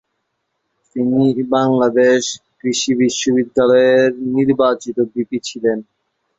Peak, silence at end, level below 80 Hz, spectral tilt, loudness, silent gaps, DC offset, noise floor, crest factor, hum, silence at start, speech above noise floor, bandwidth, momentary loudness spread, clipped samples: -2 dBFS; 0.55 s; -58 dBFS; -4.5 dB/octave; -16 LUFS; none; under 0.1%; -72 dBFS; 14 dB; none; 0.95 s; 57 dB; 7.8 kHz; 10 LU; under 0.1%